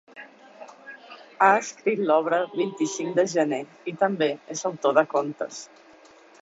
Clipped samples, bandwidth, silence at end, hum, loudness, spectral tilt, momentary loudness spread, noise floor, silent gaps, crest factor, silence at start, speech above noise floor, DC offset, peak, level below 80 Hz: under 0.1%; 8 kHz; 0.75 s; none; -24 LUFS; -4 dB/octave; 23 LU; -52 dBFS; none; 20 dB; 0.15 s; 28 dB; under 0.1%; -4 dBFS; -76 dBFS